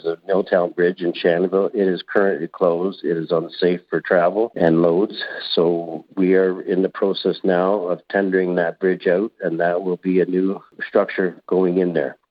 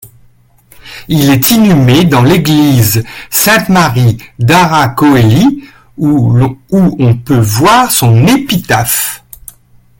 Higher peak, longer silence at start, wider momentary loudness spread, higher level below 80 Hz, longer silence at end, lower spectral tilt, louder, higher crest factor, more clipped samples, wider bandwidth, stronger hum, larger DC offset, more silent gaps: second, -4 dBFS vs 0 dBFS; about the same, 0.05 s vs 0.05 s; about the same, 5 LU vs 7 LU; second, -68 dBFS vs -36 dBFS; second, 0.15 s vs 0.85 s; first, -9.5 dB/octave vs -5 dB/octave; second, -20 LUFS vs -8 LUFS; first, 16 dB vs 8 dB; second, under 0.1% vs 0.1%; second, 5.2 kHz vs 17.5 kHz; neither; neither; neither